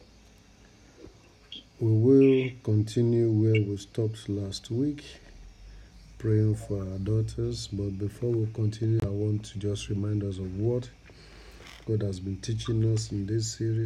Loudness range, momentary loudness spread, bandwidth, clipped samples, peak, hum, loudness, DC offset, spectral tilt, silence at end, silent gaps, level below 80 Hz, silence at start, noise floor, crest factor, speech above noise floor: 7 LU; 10 LU; 10 kHz; under 0.1%; -10 dBFS; none; -28 LUFS; under 0.1%; -7.5 dB/octave; 0 s; none; -50 dBFS; 1 s; -55 dBFS; 18 dB; 29 dB